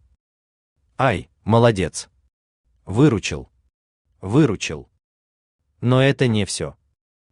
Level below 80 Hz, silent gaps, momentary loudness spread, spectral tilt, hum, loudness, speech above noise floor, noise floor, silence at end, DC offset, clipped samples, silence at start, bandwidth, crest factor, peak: -50 dBFS; 2.33-2.64 s, 3.74-4.05 s, 5.04-5.59 s; 17 LU; -6 dB/octave; none; -20 LUFS; over 72 dB; under -90 dBFS; 0.6 s; under 0.1%; under 0.1%; 1 s; 11 kHz; 20 dB; -2 dBFS